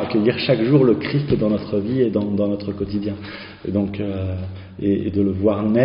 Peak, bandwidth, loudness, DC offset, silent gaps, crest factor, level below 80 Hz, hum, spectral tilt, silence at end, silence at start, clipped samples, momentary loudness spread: -4 dBFS; 5.4 kHz; -20 LUFS; under 0.1%; none; 16 dB; -46 dBFS; none; -7 dB/octave; 0 s; 0 s; under 0.1%; 12 LU